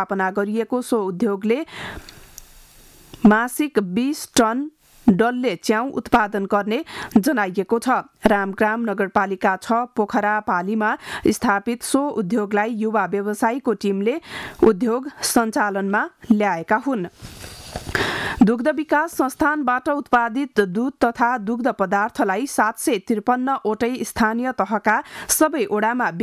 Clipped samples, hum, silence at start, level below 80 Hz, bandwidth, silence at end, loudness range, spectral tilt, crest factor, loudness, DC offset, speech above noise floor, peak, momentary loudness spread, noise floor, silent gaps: under 0.1%; none; 0 s; -50 dBFS; 15.5 kHz; 0 s; 2 LU; -4.5 dB/octave; 16 dB; -20 LUFS; under 0.1%; 27 dB; -4 dBFS; 5 LU; -48 dBFS; none